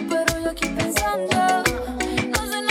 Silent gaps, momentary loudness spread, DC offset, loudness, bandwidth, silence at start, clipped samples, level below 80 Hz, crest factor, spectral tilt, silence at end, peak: none; 5 LU; under 0.1%; -22 LUFS; over 20 kHz; 0 s; under 0.1%; -38 dBFS; 20 dB; -3.5 dB/octave; 0 s; -4 dBFS